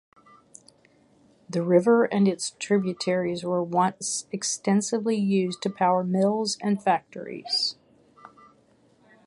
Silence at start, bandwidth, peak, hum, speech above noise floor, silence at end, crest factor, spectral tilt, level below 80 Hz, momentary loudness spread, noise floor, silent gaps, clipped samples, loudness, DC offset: 1.5 s; 11.5 kHz; -8 dBFS; none; 37 dB; 1.55 s; 18 dB; -4.5 dB/octave; -72 dBFS; 8 LU; -61 dBFS; none; under 0.1%; -25 LUFS; under 0.1%